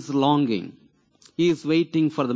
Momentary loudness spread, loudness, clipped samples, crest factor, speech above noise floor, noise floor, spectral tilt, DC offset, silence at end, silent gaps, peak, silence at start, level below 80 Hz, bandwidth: 12 LU; -22 LUFS; under 0.1%; 14 dB; 36 dB; -57 dBFS; -6.5 dB/octave; under 0.1%; 0 s; none; -8 dBFS; 0 s; -68 dBFS; 8 kHz